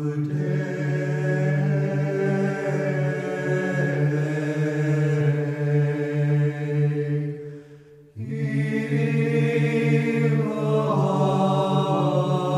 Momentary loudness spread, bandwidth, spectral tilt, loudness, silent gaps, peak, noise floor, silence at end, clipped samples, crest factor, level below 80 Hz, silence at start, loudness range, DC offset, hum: 5 LU; 8.6 kHz; -8 dB/octave; -23 LUFS; none; -8 dBFS; -47 dBFS; 0 s; under 0.1%; 14 dB; -68 dBFS; 0 s; 4 LU; under 0.1%; none